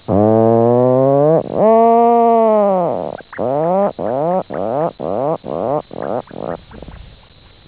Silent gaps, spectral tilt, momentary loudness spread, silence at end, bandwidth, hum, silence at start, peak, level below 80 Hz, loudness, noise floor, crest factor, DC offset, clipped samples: none; -12 dB/octave; 13 LU; 0.6 s; 4 kHz; none; 0.1 s; 0 dBFS; -46 dBFS; -14 LUFS; -44 dBFS; 14 dB; under 0.1%; under 0.1%